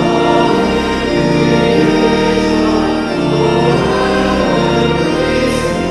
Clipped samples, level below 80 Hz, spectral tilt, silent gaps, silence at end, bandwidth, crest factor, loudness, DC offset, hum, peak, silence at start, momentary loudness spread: under 0.1%; -30 dBFS; -6 dB/octave; none; 0 s; 12.5 kHz; 12 dB; -12 LUFS; under 0.1%; none; 0 dBFS; 0 s; 3 LU